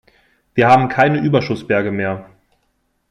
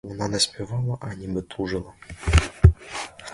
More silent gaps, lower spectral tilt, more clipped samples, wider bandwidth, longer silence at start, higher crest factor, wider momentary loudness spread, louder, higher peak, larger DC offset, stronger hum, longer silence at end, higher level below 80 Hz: neither; first, -7.5 dB/octave vs -5 dB/octave; neither; about the same, 10.5 kHz vs 11.5 kHz; first, 0.55 s vs 0.05 s; second, 16 dB vs 24 dB; second, 11 LU vs 14 LU; first, -16 LUFS vs -24 LUFS; about the same, -2 dBFS vs 0 dBFS; neither; neither; first, 0.9 s vs 0 s; second, -54 dBFS vs -28 dBFS